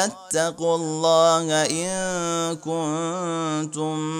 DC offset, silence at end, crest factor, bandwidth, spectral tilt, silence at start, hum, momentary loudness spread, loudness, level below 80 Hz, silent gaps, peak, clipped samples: under 0.1%; 0 s; 18 dB; 16.5 kHz; -3.5 dB/octave; 0 s; none; 8 LU; -23 LUFS; -62 dBFS; none; -4 dBFS; under 0.1%